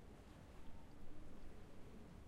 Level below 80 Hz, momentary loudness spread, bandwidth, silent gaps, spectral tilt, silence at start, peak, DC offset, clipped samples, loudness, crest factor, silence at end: -60 dBFS; 1 LU; 12 kHz; none; -6.5 dB/octave; 0 s; -40 dBFS; under 0.1%; under 0.1%; -62 LUFS; 12 dB; 0 s